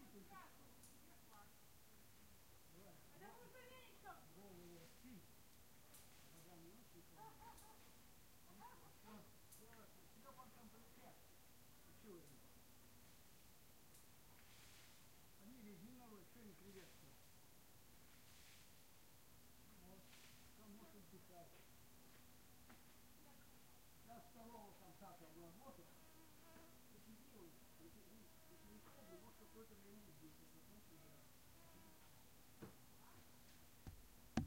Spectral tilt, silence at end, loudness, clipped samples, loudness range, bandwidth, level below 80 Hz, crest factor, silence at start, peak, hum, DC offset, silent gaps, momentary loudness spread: -4.5 dB/octave; 0 s; -65 LUFS; under 0.1%; 2 LU; 16 kHz; -76 dBFS; 38 dB; 0 s; -24 dBFS; none; under 0.1%; none; 5 LU